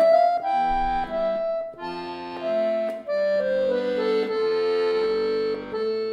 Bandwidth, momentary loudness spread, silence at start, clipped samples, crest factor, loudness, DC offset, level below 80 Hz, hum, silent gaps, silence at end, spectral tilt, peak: 8.4 kHz; 8 LU; 0 s; under 0.1%; 14 dB; -24 LUFS; under 0.1%; -46 dBFS; none; none; 0 s; -5.5 dB/octave; -8 dBFS